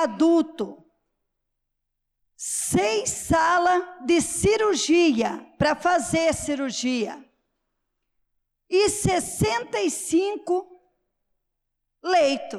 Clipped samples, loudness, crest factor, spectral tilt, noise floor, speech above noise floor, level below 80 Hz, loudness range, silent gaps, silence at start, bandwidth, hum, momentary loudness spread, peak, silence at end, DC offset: under 0.1%; -23 LUFS; 12 dB; -4 dB/octave; -79 dBFS; 57 dB; -50 dBFS; 5 LU; none; 0 s; 14.5 kHz; none; 9 LU; -12 dBFS; 0 s; under 0.1%